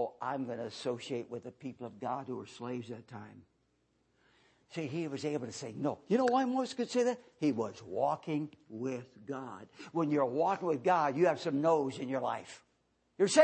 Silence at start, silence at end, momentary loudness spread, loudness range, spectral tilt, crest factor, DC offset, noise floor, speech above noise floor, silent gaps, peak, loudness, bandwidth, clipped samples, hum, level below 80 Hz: 0 s; 0 s; 15 LU; 11 LU; -5.5 dB/octave; 22 dB; under 0.1%; -76 dBFS; 41 dB; none; -12 dBFS; -34 LUFS; 8.8 kHz; under 0.1%; none; -80 dBFS